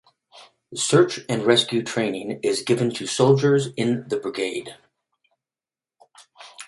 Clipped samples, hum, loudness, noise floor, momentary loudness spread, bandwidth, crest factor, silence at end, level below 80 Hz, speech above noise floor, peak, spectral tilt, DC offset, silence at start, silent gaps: under 0.1%; none; -21 LUFS; under -90 dBFS; 9 LU; 11.5 kHz; 22 dB; 0.05 s; -66 dBFS; over 69 dB; -2 dBFS; -4.5 dB/octave; under 0.1%; 0.35 s; none